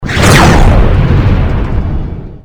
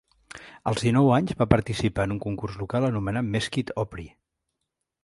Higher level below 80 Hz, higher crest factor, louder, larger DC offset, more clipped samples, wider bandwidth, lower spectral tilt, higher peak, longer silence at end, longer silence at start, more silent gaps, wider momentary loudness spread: first, -12 dBFS vs -46 dBFS; second, 8 dB vs 24 dB; first, -8 LUFS vs -25 LUFS; neither; first, 2% vs under 0.1%; first, over 20 kHz vs 11.5 kHz; about the same, -5.5 dB/octave vs -6.5 dB/octave; about the same, 0 dBFS vs -2 dBFS; second, 0.05 s vs 0.95 s; second, 0 s vs 0.35 s; neither; about the same, 13 LU vs 13 LU